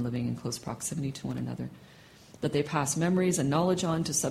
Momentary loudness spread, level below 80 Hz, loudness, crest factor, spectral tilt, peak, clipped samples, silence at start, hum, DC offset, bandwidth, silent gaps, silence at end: 9 LU; -60 dBFS; -30 LUFS; 16 dB; -5 dB/octave; -14 dBFS; under 0.1%; 0 s; none; under 0.1%; 16 kHz; none; 0 s